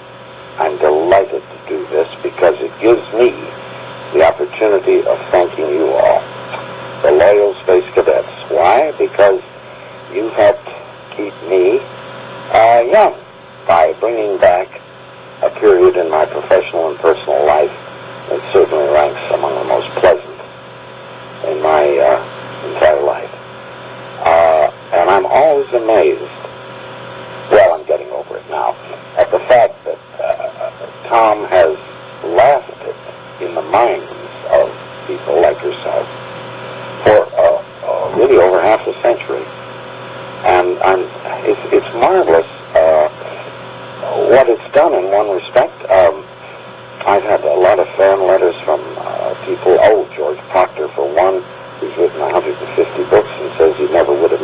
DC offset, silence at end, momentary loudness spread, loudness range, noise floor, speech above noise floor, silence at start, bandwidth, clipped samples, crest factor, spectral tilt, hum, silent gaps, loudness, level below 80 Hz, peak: under 0.1%; 0 s; 19 LU; 3 LU; -35 dBFS; 23 dB; 0 s; 4 kHz; under 0.1%; 14 dB; -9 dB/octave; none; none; -13 LUFS; -48 dBFS; 0 dBFS